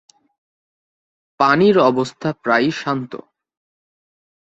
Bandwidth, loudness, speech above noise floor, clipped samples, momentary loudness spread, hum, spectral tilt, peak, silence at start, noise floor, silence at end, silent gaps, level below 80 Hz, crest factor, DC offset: 8.2 kHz; -17 LUFS; over 74 dB; under 0.1%; 12 LU; none; -6 dB/octave; -2 dBFS; 1.4 s; under -90 dBFS; 1.4 s; none; -62 dBFS; 18 dB; under 0.1%